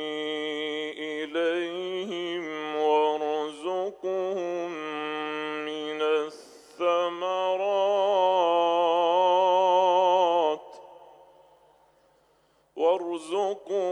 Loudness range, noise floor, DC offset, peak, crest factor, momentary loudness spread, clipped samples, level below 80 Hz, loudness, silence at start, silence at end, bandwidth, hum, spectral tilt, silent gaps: 8 LU; -65 dBFS; under 0.1%; -10 dBFS; 16 dB; 11 LU; under 0.1%; -80 dBFS; -26 LUFS; 0 s; 0 s; 10.5 kHz; none; -4 dB/octave; none